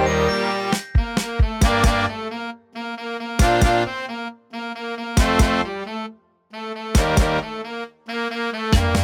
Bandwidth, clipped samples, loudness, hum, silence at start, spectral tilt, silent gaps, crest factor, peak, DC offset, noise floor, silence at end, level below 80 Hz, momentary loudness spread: 17.5 kHz; under 0.1%; -21 LUFS; none; 0 s; -5 dB/octave; none; 18 dB; -4 dBFS; under 0.1%; -42 dBFS; 0 s; -26 dBFS; 15 LU